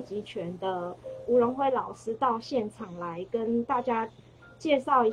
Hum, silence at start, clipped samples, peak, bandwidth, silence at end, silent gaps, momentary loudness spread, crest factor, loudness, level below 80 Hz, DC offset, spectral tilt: none; 0 s; under 0.1%; -10 dBFS; 10 kHz; 0 s; none; 13 LU; 18 dB; -29 LUFS; -66 dBFS; under 0.1%; -6 dB/octave